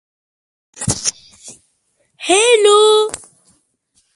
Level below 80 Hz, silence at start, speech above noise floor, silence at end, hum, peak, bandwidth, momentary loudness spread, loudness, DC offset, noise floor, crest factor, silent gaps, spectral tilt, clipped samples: -48 dBFS; 0.8 s; 52 dB; 1 s; none; 0 dBFS; 11.5 kHz; 16 LU; -13 LUFS; under 0.1%; -64 dBFS; 16 dB; none; -2 dB/octave; under 0.1%